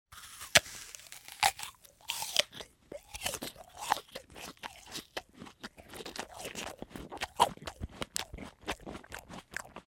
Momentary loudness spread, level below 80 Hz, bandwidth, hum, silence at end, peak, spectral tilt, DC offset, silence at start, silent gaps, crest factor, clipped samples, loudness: 17 LU; -58 dBFS; 17.5 kHz; none; 0.1 s; 0 dBFS; -1 dB/octave; under 0.1%; 0.1 s; none; 38 dB; under 0.1%; -35 LUFS